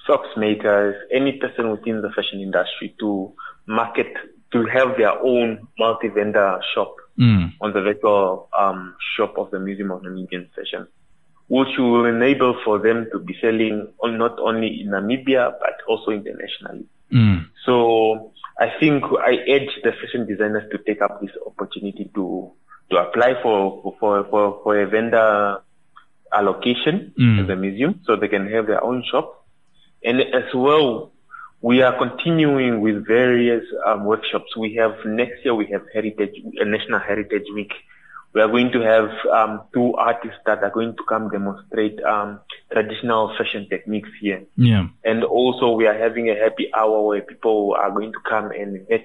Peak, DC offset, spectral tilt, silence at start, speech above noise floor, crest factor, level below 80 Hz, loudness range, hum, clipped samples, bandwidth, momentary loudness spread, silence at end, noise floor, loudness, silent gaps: -4 dBFS; 0.2%; -8.5 dB/octave; 0.05 s; 41 dB; 16 dB; -56 dBFS; 4 LU; none; under 0.1%; 5.6 kHz; 11 LU; 0 s; -61 dBFS; -20 LUFS; none